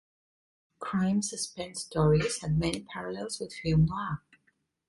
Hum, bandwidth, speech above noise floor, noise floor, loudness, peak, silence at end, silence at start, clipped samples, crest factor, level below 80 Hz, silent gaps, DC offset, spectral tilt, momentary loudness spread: none; 11.5 kHz; 44 dB; -73 dBFS; -30 LUFS; -12 dBFS; 0.7 s; 0.8 s; under 0.1%; 18 dB; -48 dBFS; none; under 0.1%; -5.5 dB/octave; 12 LU